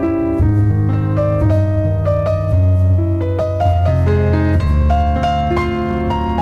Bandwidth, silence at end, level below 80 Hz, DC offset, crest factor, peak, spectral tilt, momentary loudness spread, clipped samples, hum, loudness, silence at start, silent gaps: 6.2 kHz; 0 s; -22 dBFS; under 0.1%; 10 dB; -4 dBFS; -9 dB/octave; 3 LU; under 0.1%; none; -15 LUFS; 0 s; none